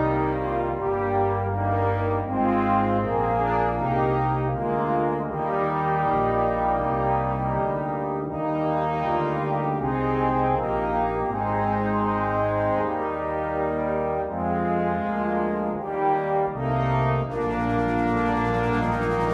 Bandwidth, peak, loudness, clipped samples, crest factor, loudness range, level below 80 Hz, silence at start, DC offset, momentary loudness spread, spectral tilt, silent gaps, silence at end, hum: 8.4 kHz; -10 dBFS; -24 LUFS; under 0.1%; 14 dB; 2 LU; -42 dBFS; 0 s; under 0.1%; 3 LU; -9 dB/octave; none; 0 s; none